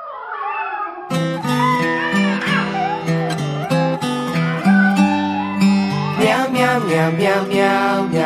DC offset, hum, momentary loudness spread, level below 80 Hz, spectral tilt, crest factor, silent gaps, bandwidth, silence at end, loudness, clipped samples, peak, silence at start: under 0.1%; none; 8 LU; -58 dBFS; -6 dB/octave; 16 dB; none; 14.5 kHz; 0 s; -17 LUFS; under 0.1%; 0 dBFS; 0 s